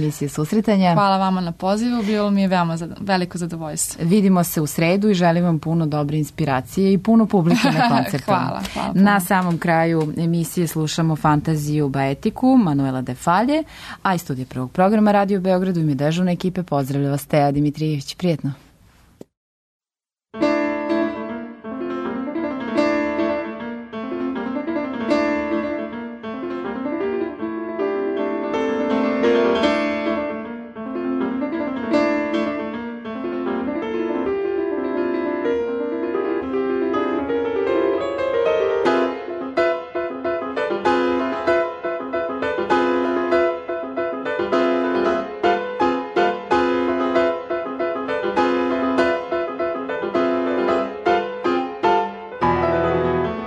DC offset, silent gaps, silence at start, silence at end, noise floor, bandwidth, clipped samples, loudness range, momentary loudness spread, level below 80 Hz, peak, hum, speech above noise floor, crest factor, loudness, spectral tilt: under 0.1%; 19.37-19.80 s; 0 s; 0 s; under -90 dBFS; 13.5 kHz; under 0.1%; 6 LU; 10 LU; -50 dBFS; -6 dBFS; none; over 72 dB; 14 dB; -20 LUFS; -6 dB/octave